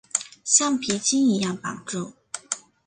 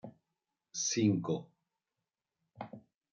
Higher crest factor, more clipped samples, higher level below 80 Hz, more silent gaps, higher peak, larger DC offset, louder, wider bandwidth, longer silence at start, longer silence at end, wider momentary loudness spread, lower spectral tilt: about the same, 22 dB vs 20 dB; neither; first, -66 dBFS vs -80 dBFS; neither; first, -2 dBFS vs -18 dBFS; neither; first, -23 LUFS vs -34 LUFS; first, 10 kHz vs 9 kHz; about the same, 0.15 s vs 0.05 s; about the same, 0.3 s vs 0.35 s; second, 14 LU vs 22 LU; second, -2.5 dB/octave vs -4.5 dB/octave